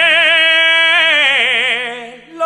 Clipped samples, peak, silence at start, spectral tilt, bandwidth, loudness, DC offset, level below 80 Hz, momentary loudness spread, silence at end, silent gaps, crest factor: under 0.1%; 0 dBFS; 0 s; 0 dB/octave; 11.5 kHz; -9 LUFS; under 0.1%; -66 dBFS; 11 LU; 0 s; none; 12 dB